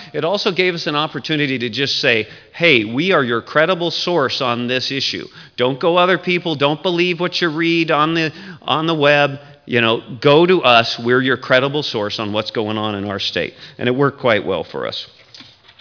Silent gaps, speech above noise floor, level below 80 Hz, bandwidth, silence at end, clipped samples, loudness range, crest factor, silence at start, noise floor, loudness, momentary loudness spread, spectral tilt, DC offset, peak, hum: none; 25 dB; -62 dBFS; 5.4 kHz; 0.4 s; under 0.1%; 4 LU; 16 dB; 0 s; -42 dBFS; -16 LUFS; 9 LU; -5 dB/octave; under 0.1%; 0 dBFS; none